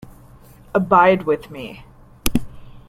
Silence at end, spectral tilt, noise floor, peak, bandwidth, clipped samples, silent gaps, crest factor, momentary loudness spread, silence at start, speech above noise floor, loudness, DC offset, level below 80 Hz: 0.1 s; -5.5 dB/octave; -45 dBFS; 0 dBFS; 16 kHz; under 0.1%; none; 20 dB; 20 LU; 0.75 s; 28 dB; -18 LUFS; under 0.1%; -38 dBFS